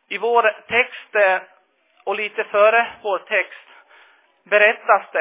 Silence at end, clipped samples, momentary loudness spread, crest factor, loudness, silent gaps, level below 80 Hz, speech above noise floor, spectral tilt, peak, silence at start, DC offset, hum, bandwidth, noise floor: 0 s; under 0.1%; 10 LU; 18 dB; -18 LUFS; none; -68 dBFS; 41 dB; -5.5 dB/octave; -2 dBFS; 0.1 s; under 0.1%; none; 3.8 kHz; -59 dBFS